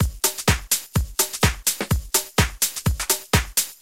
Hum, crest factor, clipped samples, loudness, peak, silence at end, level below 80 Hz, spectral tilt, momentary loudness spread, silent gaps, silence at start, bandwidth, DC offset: none; 20 dB; under 0.1%; -21 LUFS; -4 dBFS; 0.05 s; -30 dBFS; -3 dB/octave; 3 LU; none; 0 s; 17 kHz; 0.2%